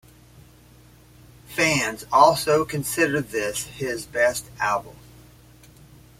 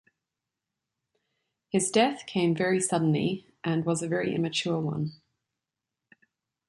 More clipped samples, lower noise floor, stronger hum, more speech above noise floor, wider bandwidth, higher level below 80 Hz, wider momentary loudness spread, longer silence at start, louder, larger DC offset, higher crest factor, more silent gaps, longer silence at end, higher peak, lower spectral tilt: neither; second, -51 dBFS vs -88 dBFS; neither; second, 29 dB vs 61 dB; first, 16.5 kHz vs 11.5 kHz; first, -54 dBFS vs -70 dBFS; first, 12 LU vs 7 LU; second, 1.5 s vs 1.75 s; first, -22 LUFS vs -27 LUFS; neither; about the same, 22 dB vs 20 dB; neither; second, 1.3 s vs 1.55 s; first, -2 dBFS vs -10 dBFS; second, -3.5 dB/octave vs -5 dB/octave